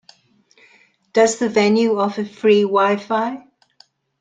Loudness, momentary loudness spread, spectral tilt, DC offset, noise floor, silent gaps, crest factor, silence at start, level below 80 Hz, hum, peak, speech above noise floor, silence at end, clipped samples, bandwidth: -17 LUFS; 8 LU; -4.5 dB/octave; under 0.1%; -56 dBFS; none; 18 dB; 1.15 s; -68 dBFS; none; -2 dBFS; 40 dB; 0.8 s; under 0.1%; 9.4 kHz